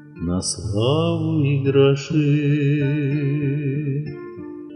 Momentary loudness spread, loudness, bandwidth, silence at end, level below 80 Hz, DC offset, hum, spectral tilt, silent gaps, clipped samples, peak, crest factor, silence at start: 10 LU; -20 LUFS; 10.5 kHz; 0 s; -50 dBFS; under 0.1%; none; -6.5 dB/octave; none; under 0.1%; -4 dBFS; 16 dB; 0 s